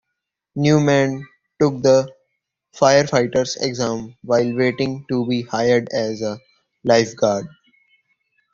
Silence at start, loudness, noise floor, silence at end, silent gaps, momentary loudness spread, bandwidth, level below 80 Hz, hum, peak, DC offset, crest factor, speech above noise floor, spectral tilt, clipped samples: 0.55 s; -19 LUFS; -80 dBFS; 1.05 s; none; 12 LU; 7.6 kHz; -56 dBFS; none; 0 dBFS; under 0.1%; 18 dB; 62 dB; -5.5 dB/octave; under 0.1%